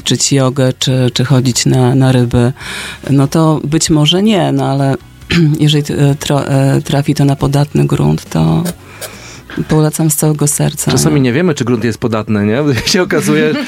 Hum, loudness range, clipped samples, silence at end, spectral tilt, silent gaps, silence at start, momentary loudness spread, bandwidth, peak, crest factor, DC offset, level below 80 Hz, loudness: none; 2 LU; under 0.1%; 0 s; -5 dB/octave; none; 0.05 s; 6 LU; 16.5 kHz; 0 dBFS; 12 dB; under 0.1%; -36 dBFS; -12 LUFS